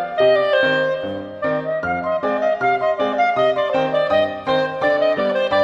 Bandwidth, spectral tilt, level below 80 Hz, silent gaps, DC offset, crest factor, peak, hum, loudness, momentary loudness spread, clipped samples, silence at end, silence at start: 7.2 kHz; -6 dB/octave; -56 dBFS; none; under 0.1%; 14 dB; -4 dBFS; none; -19 LUFS; 6 LU; under 0.1%; 0 s; 0 s